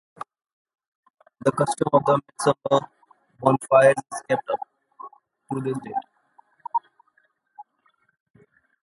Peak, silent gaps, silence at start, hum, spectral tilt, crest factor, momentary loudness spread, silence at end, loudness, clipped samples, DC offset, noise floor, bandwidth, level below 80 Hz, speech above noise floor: -2 dBFS; 0.53-0.65 s, 0.88-1.03 s, 1.10-1.14 s; 0.2 s; none; -5.5 dB/octave; 24 dB; 25 LU; 1.2 s; -23 LUFS; under 0.1%; under 0.1%; -67 dBFS; 11.5 kHz; -68 dBFS; 46 dB